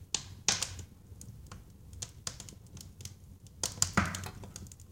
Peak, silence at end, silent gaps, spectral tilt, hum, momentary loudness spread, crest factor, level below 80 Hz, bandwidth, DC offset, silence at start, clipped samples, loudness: -8 dBFS; 0 s; none; -2 dB/octave; none; 22 LU; 30 dB; -54 dBFS; 17 kHz; under 0.1%; 0 s; under 0.1%; -34 LUFS